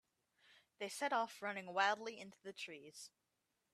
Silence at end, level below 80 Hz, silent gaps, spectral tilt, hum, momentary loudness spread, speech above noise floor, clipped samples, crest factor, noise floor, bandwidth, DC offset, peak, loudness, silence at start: 0.65 s; under -90 dBFS; none; -2 dB/octave; none; 18 LU; 44 dB; under 0.1%; 24 dB; -87 dBFS; 15 kHz; under 0.1%; -20 dBFS; -42 LUFS; 0.8 s